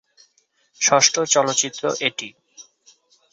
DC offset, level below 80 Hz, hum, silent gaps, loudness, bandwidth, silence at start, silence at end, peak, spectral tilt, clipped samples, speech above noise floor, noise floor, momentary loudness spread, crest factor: under 0.1%; -68 dBFS; none; none; -18 LUFS; 8 kHz; 0.8 s; 0.7 s; -2 dBFS; -1 dB/octave; under 0.1%; 45 dB; -64 dBFS; 12 LU; 22 dB